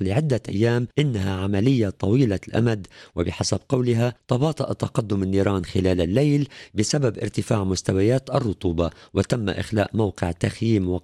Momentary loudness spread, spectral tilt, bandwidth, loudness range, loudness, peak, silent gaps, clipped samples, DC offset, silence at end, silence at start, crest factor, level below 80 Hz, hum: 5 LU; -6.5 dB/octave; 12.5 kHz; 1 LU; -23 LUFS; -8 dBFS; none; under 0.1%; under 0.1%; 0.05 s; 0 s; 14 dB; -46 dBFS; none